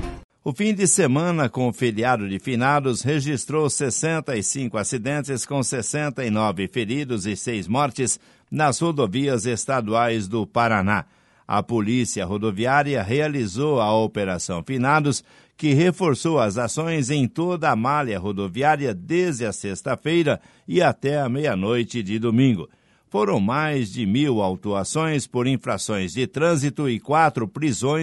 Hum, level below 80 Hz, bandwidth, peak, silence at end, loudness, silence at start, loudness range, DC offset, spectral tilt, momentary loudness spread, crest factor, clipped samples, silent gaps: none; -52 dBFS; 11.5 kHz; -4 dBFS; 0 s; -22 LUFS; 0 s; 2 LU; under 0.1%; -5 dB/octave; 6 LU; 18 dB; under 0.1%; 0.24-0.29 s